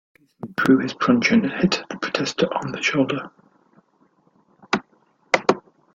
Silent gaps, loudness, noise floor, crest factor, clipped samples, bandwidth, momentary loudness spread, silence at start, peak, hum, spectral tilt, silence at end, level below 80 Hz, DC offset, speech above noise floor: none; -21 LUFS; -61 dBFS; 22 dB; under 0.1%; 8.8 kHz; 11 LU; 0.45 s; 0 dBFS; none; -5 dB/octave; 0.35 s; -62 dBFS; under 0.1%; 41 dB